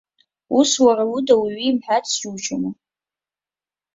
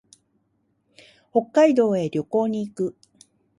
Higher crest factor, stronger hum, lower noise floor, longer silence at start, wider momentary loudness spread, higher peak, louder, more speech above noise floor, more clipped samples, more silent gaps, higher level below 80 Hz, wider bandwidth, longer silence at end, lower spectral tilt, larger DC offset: about the same, 18 dB vs 18 dB; neither; first, under -90 dBFS vs -69 dBFS; second, 0.5 s vs 1.35 s; about the same, 10 LU vs 11 LU; first, -2 dBFS vs -6 dBFS; first, -19 LUFS vs -22 LUFS; first, over 72 dB vs 49 dB; neither; neither; first, -64 dBFS vs -70 dBFS; second, 8 kHz vs 11.5 kHz; first, 1.25 s vs 0.7 s; second, -3 dB/octave vs -7 dB/octave; neither